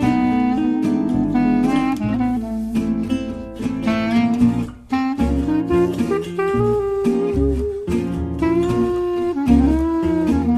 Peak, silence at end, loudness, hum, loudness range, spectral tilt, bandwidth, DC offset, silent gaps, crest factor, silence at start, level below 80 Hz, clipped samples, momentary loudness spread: -2 dBFS; 0 s; -19 LUFS; none; 1 LU; -8 dB/octave; 13 kHz; under 0.1%; none; 16 dB; 0 s; -32 dBFS; under 0.1%; 6 LU